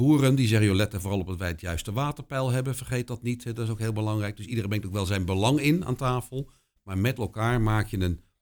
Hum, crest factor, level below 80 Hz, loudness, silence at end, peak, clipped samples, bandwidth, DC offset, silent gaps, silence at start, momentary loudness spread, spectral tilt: none; 18 dB; -44 dBFS; -27 LUFS; 0.25 s; -8 dBFS; under 0.1%; 20 kHz; under 0.1%; none; 0 s; 10 LU; -6 dB/octave